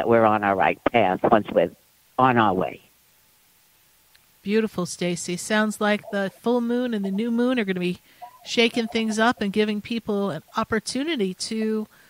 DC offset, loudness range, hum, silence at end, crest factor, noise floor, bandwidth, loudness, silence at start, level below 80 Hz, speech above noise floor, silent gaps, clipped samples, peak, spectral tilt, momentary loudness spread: under 0.1%; 4 LU; none; 0.25 s; 20 dB; -59 dBFS; 16 kHz; -23 LUFS; 0 s; -58 dBFS; 37 dB; none; under 0.1%; -2 dBFS; -5 dB/octave; 8 LU